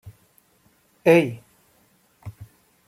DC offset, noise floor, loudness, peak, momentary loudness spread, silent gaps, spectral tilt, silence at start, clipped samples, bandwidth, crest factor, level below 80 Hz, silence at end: under 0.1%; -62 dBFS; -19 LUFS; -4 dBFS; 26 LU; none; -7 dB/octave; 1.05 s; under 0.1%; 15.5 kHz; 22 dB; -64 dBFS; 0.45 s